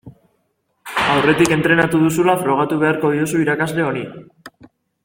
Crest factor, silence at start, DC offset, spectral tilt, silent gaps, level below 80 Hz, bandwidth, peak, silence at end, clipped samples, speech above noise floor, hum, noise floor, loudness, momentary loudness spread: 18 dB; 0.05 s; under 0.1%; -5.5 dB/octave; none; -52 dBFS; 17 kHz; 0 dBFS; 0.55 s; under 0.1%; 51 dB; none; -67 dBFS; -16 LUFS; 8 LU